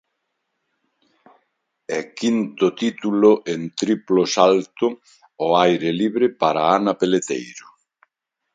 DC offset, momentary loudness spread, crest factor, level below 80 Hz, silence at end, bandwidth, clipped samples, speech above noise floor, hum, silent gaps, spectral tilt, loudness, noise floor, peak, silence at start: under 0.1%; 11 LU; 20 dB; -68 dBFS; 0.95 s; 9.4 kHz; under 0.1%; 58 dB; none; none; -5 dB/octave; -19 LUFS; -77 dBFS; 0 dBFS; 1.9 s